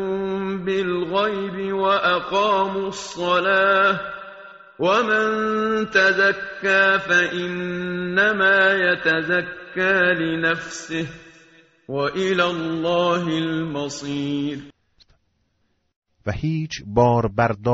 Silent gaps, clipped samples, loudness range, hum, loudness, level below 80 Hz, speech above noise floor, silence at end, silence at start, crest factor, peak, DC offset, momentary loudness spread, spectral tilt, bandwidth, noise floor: 15.96-16.02 s; under 0.1%; 7 LU; none; -20 LUFS; -52 dBFS; 48 dB; 0 s; 0 s; 18 dB; -4 dBFS; under 0.1%; 11 LU; -3 dB/octave; 8 kHz; -69 dBFS